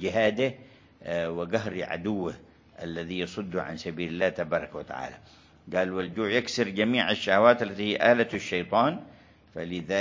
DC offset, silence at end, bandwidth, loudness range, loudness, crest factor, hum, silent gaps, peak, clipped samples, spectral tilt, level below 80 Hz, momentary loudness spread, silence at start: under 0.1%; 0 s; 7.6 kHz; 8 LU; -27 LUFS; 24 dB; none; none; -4 dBFS; under 0.1%; -5 dB/octave; -58 dBFS; 15 LU; 0 s